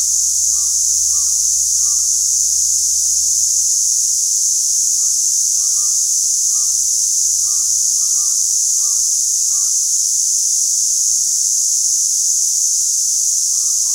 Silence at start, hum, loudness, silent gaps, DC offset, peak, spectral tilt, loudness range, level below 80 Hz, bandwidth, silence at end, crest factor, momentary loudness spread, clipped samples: 0 s; none; -12 LUFS; none; under 0.1%; -2 dBFS; 4 dB/octave; 0 LU; -52 dBFS; 16 kHz; 0 s; 14 dB; 1 LU; under 0.1%